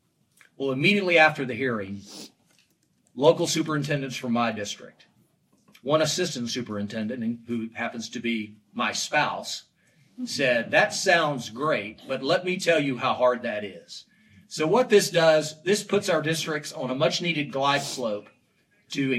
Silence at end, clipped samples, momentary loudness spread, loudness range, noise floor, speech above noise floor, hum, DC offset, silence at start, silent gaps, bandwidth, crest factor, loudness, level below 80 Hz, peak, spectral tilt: 0 s; under 0.1%; 14 LU; 5 LU; -67 dBFS; 42 dB; none; under 0.1%; 0.6 s; none; 15 kHz; 22 dB; -25 LUFS; -74 dBFS; -4 dBFS; -4 dB/octave